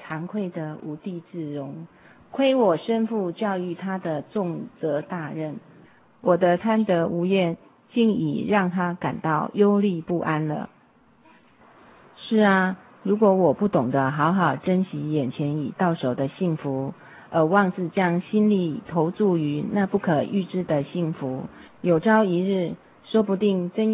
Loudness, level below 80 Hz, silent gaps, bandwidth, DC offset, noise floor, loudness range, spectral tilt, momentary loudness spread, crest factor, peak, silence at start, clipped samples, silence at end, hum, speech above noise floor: -24 LUFS; -64 dBFS; none; 4 kHz; under 0.1%; -57 dBFS; 4 LU; -11.5 dB/octave; 13 LU; 18 dB; -6 dBFS; 0 s; under 0.1%; 0 s; none; 34 dB